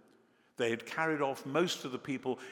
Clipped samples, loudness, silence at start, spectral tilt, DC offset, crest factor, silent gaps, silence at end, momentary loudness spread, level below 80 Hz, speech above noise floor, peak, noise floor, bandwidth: under 0.1%; -35 LUFS; 0.6 s; -4.5 dB/octave; under 0.1%; 20 dB; none; 0 s; 6 LU; -86 dBFS; 33 dB; -16 dBFS; -67 dBFS; 18 kHz